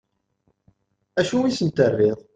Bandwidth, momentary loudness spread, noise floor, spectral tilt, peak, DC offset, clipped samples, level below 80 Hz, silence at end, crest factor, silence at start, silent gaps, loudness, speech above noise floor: 9.2 kHz; 6 LU; -69 dBFS; -6 dB/octave; -4 dBFS; under 0.1%; under 0.1%; -60 dBFS; 0.2 s; 20 dB; 1.15 s; none; -21 LUFS; 49 dB